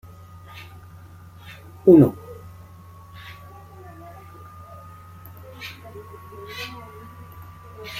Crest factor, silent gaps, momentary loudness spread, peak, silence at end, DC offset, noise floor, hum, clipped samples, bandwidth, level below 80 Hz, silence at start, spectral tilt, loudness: 24 dB; none; 26 LU; -2 dBFS; 0 s; under 0.1%; -44 dBFS; none; under 0.1%; 16 kHz; -56 dBFS; 1.85 s; -8 dB/octave; -18 LUFS